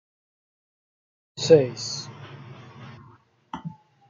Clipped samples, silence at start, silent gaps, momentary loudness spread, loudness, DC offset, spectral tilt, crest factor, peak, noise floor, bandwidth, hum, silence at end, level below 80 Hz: under 0.1%; 1.35 s; none; 26 LU; -22 LUFS; under 0.1%; -5 dB/octave; 24 dB; -4 dBFS; -55 dBFS; 7.6 kHz; none; 0.35 s; -68 dBFS